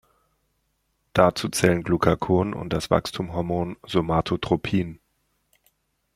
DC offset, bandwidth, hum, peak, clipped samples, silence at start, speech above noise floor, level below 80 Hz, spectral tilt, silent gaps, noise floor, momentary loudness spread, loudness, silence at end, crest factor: under 0.1%; 15.5 kHz; none; -2 dBFS; under 0.1%; 1.15 s; 49 dB; -48 dBFS; -5.5 dB/octave; none; -72 dBFS; 8 LU; -23 LUFS; 1.2 s; 22 dB